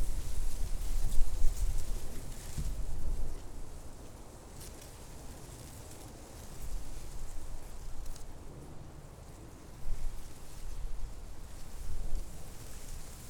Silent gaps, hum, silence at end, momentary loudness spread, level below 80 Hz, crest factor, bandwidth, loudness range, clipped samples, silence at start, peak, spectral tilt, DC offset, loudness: none; none; 0 s; 11 LU; -36 dBFS; 20 dB; 14 kHz; 8 LU; under 0.1%; 0 s; -10 dBFS; -4.5 dB/octave; under 0.1%; -45 LUFS